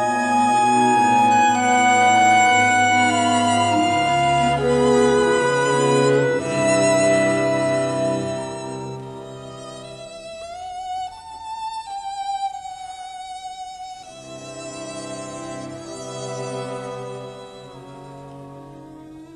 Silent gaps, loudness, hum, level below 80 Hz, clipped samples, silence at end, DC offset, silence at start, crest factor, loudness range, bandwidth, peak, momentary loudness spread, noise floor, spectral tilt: none; -18 LUFS; none; -52 dBFS; under 0.1%; 0 s; under 0.1%; 0 s; 16 dB; 17 LU; 12.5 kHz; -6 dBFS; 21 LU; -40 dBFS; -4 dB/octave